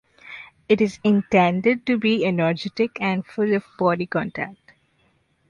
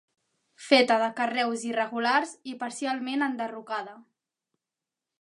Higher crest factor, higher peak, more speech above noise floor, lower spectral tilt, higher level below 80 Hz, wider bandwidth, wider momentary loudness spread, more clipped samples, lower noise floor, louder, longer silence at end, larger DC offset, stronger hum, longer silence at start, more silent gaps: second, 18 dB vs 24 dB; about the same, -4 dBFS vs -4 dBFS; second, 43 dB vs 62 dB; first, -7 dB/octave vs -2.5 dB/octave; first, -60 dBFS vs -84 dBFS; second, 9.2 kHz vs 11.5 kHz; about the same, 14 LU vs 14 LU; neither; second, -64 dBFS vs -89 dBFS; first, -21 LUFS vs -27 LUFS; second, 0.95 s vs 1.2 s; neither; neither; second, 0.25 s vs 0.6 s; neither